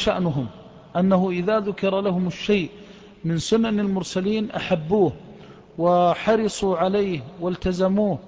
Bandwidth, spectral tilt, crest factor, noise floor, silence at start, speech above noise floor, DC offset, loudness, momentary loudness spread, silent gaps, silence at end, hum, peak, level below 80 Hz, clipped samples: 8 kHz; -6.5 dB/octave; 14 dB; -44 dBFS; 0 s; 22 dB; under 0.1%; -22 LUFS; 9 LU; none; 0 s; none; -8 dBFS; -48 dBFS; under 0.1%